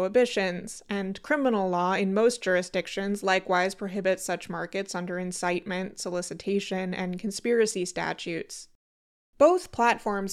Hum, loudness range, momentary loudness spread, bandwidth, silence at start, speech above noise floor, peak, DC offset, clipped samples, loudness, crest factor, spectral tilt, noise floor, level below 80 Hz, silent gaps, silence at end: none; 4 LU; 9 LU; 14.5 kHz; 0 s; over 63 dB; -8 dBFS; under 0.1%; under 0.1%; -27 LUFS; 20 dB; -4.5 dB/octave; under -90 dBFS; -62 dBFS; 8.75-9.33 s; 0 s